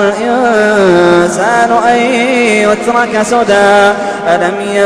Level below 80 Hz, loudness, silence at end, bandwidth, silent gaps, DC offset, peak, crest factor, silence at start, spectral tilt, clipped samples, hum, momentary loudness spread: -44 dBFS; -9 LUFS; 0 s; 11 kHz; none; under 0.1%; 0 dBFS; 8 dB; 0 s; -4.5 dB/octave; 0.3%; none; 4 LU